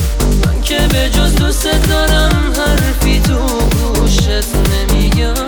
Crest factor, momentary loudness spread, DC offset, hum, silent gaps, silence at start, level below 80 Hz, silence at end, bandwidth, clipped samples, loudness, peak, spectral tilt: 12 dB; 2 LU; under 0.1%; none; none; 0 s; -14 dBFS; 0 s; over 20 kHz; under 0.1%; -13 LUFS; 0 dBFS; -4.5 dB/octave